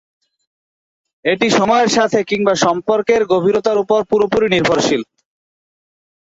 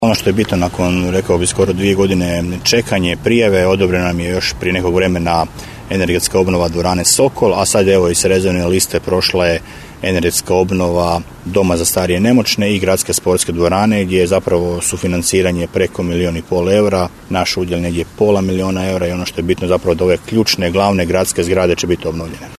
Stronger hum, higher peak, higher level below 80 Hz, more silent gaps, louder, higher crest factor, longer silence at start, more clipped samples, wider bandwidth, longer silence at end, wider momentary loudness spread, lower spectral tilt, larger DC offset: neither; about the same, -2 dBFS vs 0 dBFS; second, -52 dBFS vs -36 dBFS; neither; about the same, -15 LUFS vs -14 LUFS; about the same, 14 dB vs 14 dB; first, 1.25 s vs 0 s; neither; second, 8 kHz vs 14 kHz; first, 1.35 s vs 0 s; about the same, 5 LU vs 6 LU; about the same, -4 dB/octave vs -4.5 dB/octave; neither